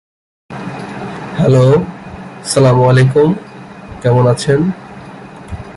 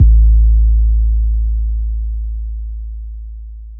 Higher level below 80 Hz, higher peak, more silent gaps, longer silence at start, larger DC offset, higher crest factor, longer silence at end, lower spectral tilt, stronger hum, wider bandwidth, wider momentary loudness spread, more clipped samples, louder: second, -40 dBFS vs -12 dBFS; about the same, -2 dBFS vs 0 dBFS; neither; first, 0.5 s vs 0 s; neither; about the same, 12 dB vs 12 dB; about the same, 0 s vs 0 s; second, -6.5 dB/octave vs -17 dB/octave; neither; first, 11.5 kHz vs 0.4 kHz; first, 23 LU vs 19 LU; neither; first, -12 LUFS vs -16 LUFS